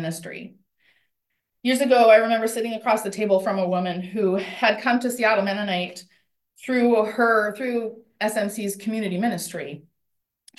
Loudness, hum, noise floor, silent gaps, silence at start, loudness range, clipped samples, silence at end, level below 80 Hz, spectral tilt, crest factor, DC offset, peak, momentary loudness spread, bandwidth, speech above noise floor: -22 LUFS; none; -78 dBFS; none; 0 s; 3 LU; under 0.1%; 0.8 s; -74 dBFS; -4.5 dB/octave; 20 dB; under 0.1%; -4 dBFS; 16 LU; 12.5 kHz; 56 dB